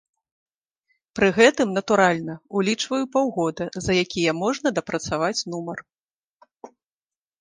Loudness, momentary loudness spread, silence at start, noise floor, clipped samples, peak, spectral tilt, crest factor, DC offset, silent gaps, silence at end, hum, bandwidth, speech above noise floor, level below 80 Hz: -22 LUFS; 12 LU; 1.15 s; under -90 dBFS; under 0.1%; -2 dBFS; -4.5 dB/octave; 22 dB; under 0.1%; 5.98-6.02 s, 6.12-6.22 s, 6.30-6.40 s; 0.75 s; none; 10 kHz; over 68 dB; -54 dBFS